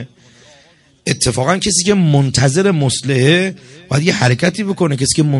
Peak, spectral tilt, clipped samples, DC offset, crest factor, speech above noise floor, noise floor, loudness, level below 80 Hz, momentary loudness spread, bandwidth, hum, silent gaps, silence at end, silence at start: 0 dBFS; -4.5 dB/octave; under 0.1%; under 0.1%; 14 dB; 36 dB; -49 dBFS; -14 LUFS; -42 dBFS; 5 LU; 11.5 kHz; none; none; 0 s; 0 s